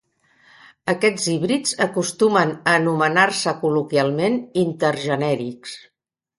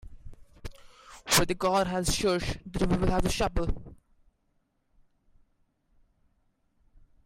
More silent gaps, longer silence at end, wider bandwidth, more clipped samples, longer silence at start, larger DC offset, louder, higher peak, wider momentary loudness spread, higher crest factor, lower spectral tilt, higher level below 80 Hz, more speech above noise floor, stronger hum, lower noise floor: neither; second, 0.6 s vs 3.3 s; second, 11.5 kHz vs 16 kHz; neither; first, 0.85 s vs 0.05 s; neither; first, -20 LUFS vs -28 LUFS; first, 0 dBFS vs -10 dBFS; second, 8 LU vs 23 LU; about the same, 20 dB vs 20 dB; about the same, -4.5 dB/octave vs -4 dB/octave; second, -64 dBFS vs -40 dBFS; second, 37 dB vs 46 dB; neither; second, -57 dBFS vs -73 dBFS